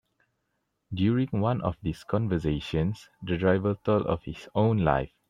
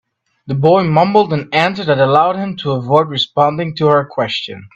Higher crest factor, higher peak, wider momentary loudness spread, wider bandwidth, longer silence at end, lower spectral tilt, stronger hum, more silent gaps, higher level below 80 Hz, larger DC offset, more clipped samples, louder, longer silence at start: first, 20 dB vs 14 dB; second, -8 dBFS vs 0 dBFS; about the same, 8 LU vs 8 LU; first, 10 kHz vs 8 kHz; about the same, 0.2 s vs 0.1 s; first, -8.5 dB/octave vs -7 dB/octave; neither; neither; first, -48 dBFS vs -54 dBFS; neither; neither; second, -27 LUFS vs -14 LUFS; first, 0.9 s vs 0.45 s